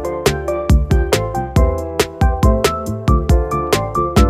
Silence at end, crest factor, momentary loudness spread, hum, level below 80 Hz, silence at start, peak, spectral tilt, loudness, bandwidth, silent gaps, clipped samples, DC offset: 0 s; 14 dB; 4 LU; none; -18 dBFS; 0 s; 0 dBFS; -6 dB/octave; -17 LUFS; 15.5 kHz; none; under 0.1%; under 0.1%